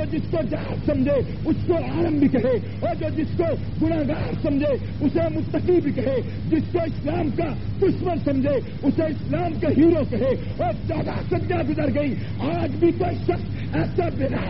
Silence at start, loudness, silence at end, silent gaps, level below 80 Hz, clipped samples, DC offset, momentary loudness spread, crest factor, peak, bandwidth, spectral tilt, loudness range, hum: 0 s; -23 LUFS; 0 s; none; -38 dBFS; under 0.1%; 2%; 6 LU; 14 dB; -8 dBFS; 5.8 kHz; -8 dB/octave; 2 LU; none